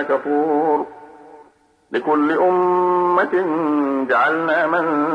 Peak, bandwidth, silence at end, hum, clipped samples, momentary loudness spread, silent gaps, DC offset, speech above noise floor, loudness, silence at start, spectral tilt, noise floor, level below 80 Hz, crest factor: -6 dBFS; 6 kHz; 0 s; none; under 0.1%; 4 LU; none; under 0.1%; 36 dB; -18 LUFS; 0 s; -7.5 dB/octave; -53 dBFS; -68 dBFS; 12 dB